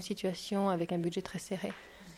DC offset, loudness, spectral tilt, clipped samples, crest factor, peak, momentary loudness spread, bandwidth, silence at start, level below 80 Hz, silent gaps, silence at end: under 0.1%; -35 LUFS; -5.5 dB/octave; under 0.1%; 18 dB; -18 dBFS; 8 LU; 15 kHz; 0 s; -66 dBFS; none; 0 s